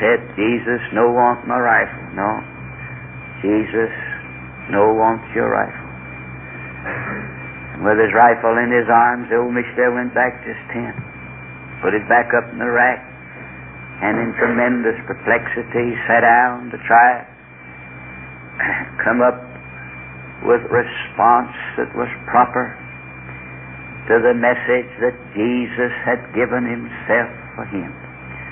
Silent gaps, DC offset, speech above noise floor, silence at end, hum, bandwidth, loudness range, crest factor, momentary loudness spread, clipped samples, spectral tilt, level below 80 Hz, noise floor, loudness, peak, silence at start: none; under 0.1%; 22 dB; 0 s; none; 3.6 kHz; 5 LU; 18 dB; 19 LU; under 0.1%; -10 dB/octave; -48 dBFS; -38 dBFS; -17 LUFS; 0 dBFS; 0 s